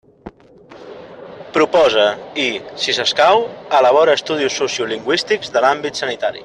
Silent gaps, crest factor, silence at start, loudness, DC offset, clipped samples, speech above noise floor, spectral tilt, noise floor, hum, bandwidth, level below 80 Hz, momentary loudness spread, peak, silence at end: none; 16 dB; 0.25 s; -16 LUFS; under 0.1%; under 0.1%; 27 dB; -2.5 dB/octave; -43 dBFS; none; 10.5 kHz; -58 dBFS; 17 LU; 0 dBFS; 0 s